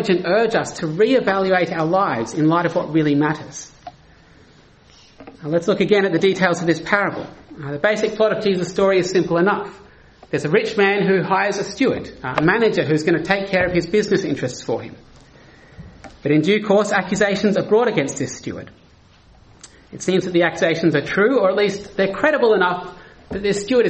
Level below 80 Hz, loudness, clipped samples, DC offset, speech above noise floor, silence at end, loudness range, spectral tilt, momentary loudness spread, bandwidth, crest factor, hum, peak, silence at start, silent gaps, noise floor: -52 dBFS; -18 LUFS; under 0.1%; under 0.1%; 32 dB; 0 s; 4 LU; -5.5 dB/octave; 11 LU; 8.4 kHz; 18 dB; none; 0 dBFS; 0 s; none; -50 dBFS